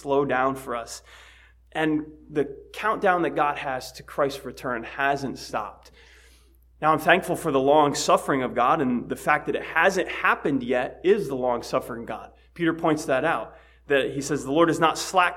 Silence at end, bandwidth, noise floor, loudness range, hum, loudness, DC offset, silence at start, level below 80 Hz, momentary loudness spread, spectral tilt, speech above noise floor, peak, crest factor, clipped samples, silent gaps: 0 s; 16.5 kHz; -55 dBFS; 5 LU; none; -24 LUFS; under 0.1%; 0 s; -54 dBFS; 12 LU; -4.5 dB/octave; 31 dB; -2 dBFS; 22 dB; under 0.1%; none